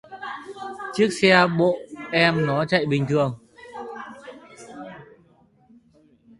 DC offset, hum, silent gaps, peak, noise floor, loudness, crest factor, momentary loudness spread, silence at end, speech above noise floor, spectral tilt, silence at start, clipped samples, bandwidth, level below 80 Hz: under 0.1%; none; none; 0 dBFS; -58 dBFS; -20 LUFS; 24 dB; 24 LU; 1.35 s; 38 dB; -5.5 dB/octave; 0.1 s; under 0.1%; 11.5 kHz; -60 dBFS